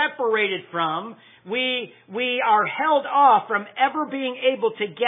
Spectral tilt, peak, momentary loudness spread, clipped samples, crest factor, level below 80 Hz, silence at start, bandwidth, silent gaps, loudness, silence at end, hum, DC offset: -7 dB/octave; -4 dBFS; 11 LU; under 0.1%; 18 dB; under -90 dBFS; 0 s; 3.9 kHz; none; -22 LUFS; 0 s; none; under 0.1%